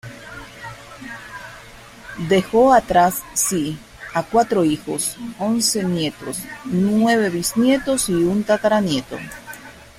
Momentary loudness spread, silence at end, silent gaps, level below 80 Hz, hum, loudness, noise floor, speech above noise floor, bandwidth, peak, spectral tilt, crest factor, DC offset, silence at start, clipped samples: 20 LU; 0.15 s; none; -48 dBFS; none; -19 LUFS; -41 dBFS; 23 dB; 16 kHz; -2 dBFS; -4 dB/octave; 18 dB; under 0.1%; 0.05 s; under 0.1%